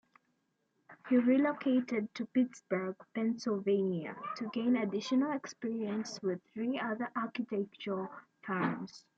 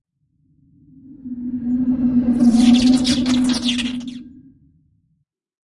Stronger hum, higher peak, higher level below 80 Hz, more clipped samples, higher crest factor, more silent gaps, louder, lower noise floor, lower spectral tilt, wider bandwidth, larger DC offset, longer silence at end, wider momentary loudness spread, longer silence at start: neither; second, -18 dBFS vs -4 dBFS; second, -84 dBFS vs -44 dBFS; neither; about the same, 16 dB vs 16 dB; neither; second, -34 LUFS vs -17 LUFS; first, -79 dBFS vs -68 dBFS; first, -6 dB/octave vs -4.5 dB/octave; second, 7.6 kHz vs 11.5 kHz; neither; second, 0.2 s vs 1.5 s; second, 9 LU vs 20 LU; second, 0.9 s vs 1.1 s